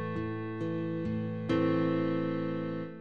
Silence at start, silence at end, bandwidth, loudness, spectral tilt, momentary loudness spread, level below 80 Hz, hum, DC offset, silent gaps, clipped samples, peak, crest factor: 0 s; 0 s; 7 kHz; -32 LUFS; -9 dB/octave; 7 LU; -64 dBFS; none; 0.2%; none; under 0.1%; -18 dBFS; 14 dB